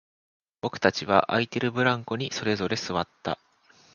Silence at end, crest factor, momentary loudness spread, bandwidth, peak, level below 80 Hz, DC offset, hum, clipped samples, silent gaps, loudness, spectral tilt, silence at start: 0.6 s; 24 dB; 11 LU; 7.2 kHz; -2 dBFS; -58 dBFS; under 0.1%; none; under 0.1%; none; -27 LUFS; -5 dB/octave; 0.65 s